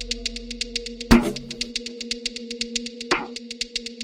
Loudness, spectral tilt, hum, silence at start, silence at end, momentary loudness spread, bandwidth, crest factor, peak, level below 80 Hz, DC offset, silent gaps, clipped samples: -25 LUFS; -3.5 dB/octave; none; 0 s; 0 s; 11 LU; 16.5 kHz; 24 dB; -2 dBFS; -36 dBFS; under 0.1%; none; under 0.1%